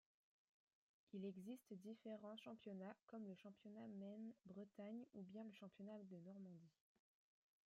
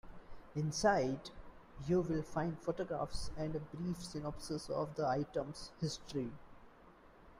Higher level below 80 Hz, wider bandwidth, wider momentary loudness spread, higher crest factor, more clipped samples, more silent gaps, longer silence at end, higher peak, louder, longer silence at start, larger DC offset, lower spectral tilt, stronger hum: second, under -90 dBFS vs -56 dBFS; second, 11.5 kHz vs 15.5 kHz; second, 5 LU vs 14 LU; about the same, 16 dB vs 20 dB; neither; first, 3.03-3.07 s vs none; first, 0.95 s vs 0 s; second, -44 dBFS vs -20 dBFS; second, -58 LUFS vs -39 LUFS; first, 1.15 s vs 0.05 s; neither; first, -7.5 dB/octave vs -5.5 dB/octave; neither